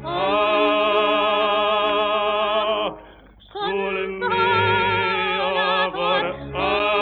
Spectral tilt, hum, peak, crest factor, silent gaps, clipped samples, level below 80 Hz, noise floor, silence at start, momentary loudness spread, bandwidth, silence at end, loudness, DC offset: -6.5 dB/octave; none; -6 dBFS; 14 dB; none; under 0.1%; -50 dBFS; -47 dBFS; 0 s; 7 LU; 5.4 kHz; 0 s; -20 LUFS; under 0.1%